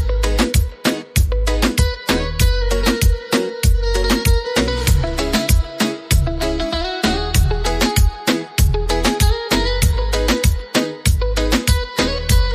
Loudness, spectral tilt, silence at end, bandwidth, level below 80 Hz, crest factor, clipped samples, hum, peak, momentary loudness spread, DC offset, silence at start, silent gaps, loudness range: -18 LUFS; -4.5 dB/octave; 0 s; 15.5 kHz; -18 dBFS; 14 dB; under 0.1%; none; -2 dBFS; 3 LU; under 0.1%; 0 s; none; 1 LU